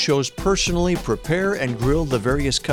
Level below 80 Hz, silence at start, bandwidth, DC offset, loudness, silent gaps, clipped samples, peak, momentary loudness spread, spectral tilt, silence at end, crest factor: -32 dBFS; 0 s; 17.5 kHz; under 0.1%; -21 LUFS; none; under 0.1%; -8 dBFS; 3 LU; -4.5 dB/octave; 0 s; 12 dB